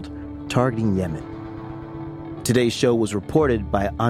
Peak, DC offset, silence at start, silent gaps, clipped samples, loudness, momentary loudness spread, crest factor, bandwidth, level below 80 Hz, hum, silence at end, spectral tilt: -4 dBFS; under 0.1%; 0 s; none; under 0.1%; -22 LUFS; 15 LU; 18 dB; 16 kHz; -40 dBFS; none; 0 s; -6 dB/octave